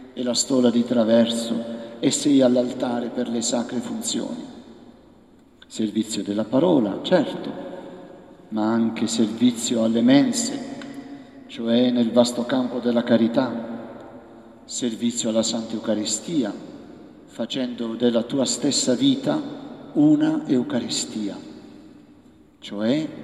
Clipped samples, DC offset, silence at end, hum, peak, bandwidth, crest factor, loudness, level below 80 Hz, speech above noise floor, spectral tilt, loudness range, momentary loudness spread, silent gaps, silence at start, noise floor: under 0.1%; under 0.1%; 0 s; none; -4 dBFS; 13 kHz; 20 dB; -22 LUFS; -64 dBFS; 31 dB; -4 dB/octave; 5 LU; 19 LU; none; 0 s; -52 dBFS